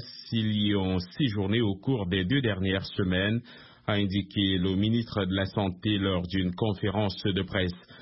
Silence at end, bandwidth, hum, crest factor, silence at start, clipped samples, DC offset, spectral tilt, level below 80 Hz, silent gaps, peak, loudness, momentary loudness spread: 0 s; 5.8 kHz; none; 16 dB; 0 s; under 0.1%; under 0.1%; -10 dB/octave; -54 dBFS; none; -12 dBFS; -28 LUFS; 4 LU